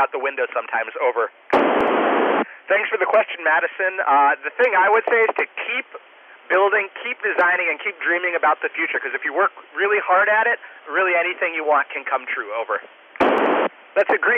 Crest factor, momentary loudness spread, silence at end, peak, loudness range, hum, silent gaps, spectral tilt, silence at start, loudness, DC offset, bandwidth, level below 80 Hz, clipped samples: 12 dB; 8 LU; 0 s; -8 dBFS; 3 LU; none; none; -5.5 dB/octave; 0 s; -19 LUFS; under 0.1%; 7 kHz; -64 dBFS; under 0.1%